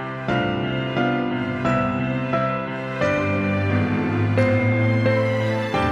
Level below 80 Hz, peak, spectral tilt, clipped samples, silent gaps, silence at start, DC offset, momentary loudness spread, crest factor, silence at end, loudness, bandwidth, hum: -48 dBFS; -6 dBFS; -7.5 dB/octave; under 0.1%; none; 0 s; under 0.1%; 5 LU; 14 dB; 0 s; -21 LUFS; 8.4 kHz; none